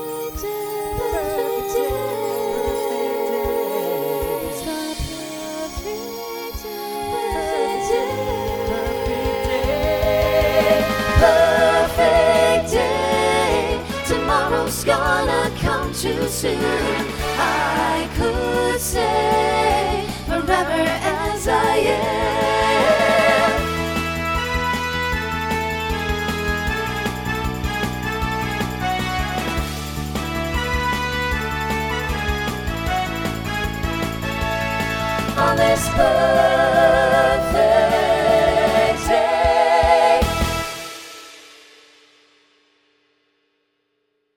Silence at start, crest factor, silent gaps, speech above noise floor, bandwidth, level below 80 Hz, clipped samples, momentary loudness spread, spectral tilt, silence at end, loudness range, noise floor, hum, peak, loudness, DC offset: 0 s; 18 dB; none; 53 dB; over 20 kHz; -32 dBFS; under 0.1%; 10 LU; -4.5 dB/octave; 2.85 s; 8 LU; -70 dBFS; none; 0 dBFS; -19 LUFS; under 0.1%